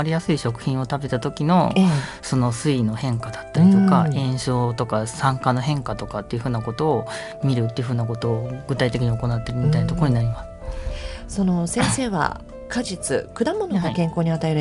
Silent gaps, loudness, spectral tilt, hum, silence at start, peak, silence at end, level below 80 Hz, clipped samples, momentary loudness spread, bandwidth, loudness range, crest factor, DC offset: none; -22 LUFS; -6.5 dB/octave; none; 0 s; -4 dBFS; 0 s; -40 dBFS; under 0.1%; 10 LU; 11.5 kHz; 4 LU; 18 dB; under 0.1%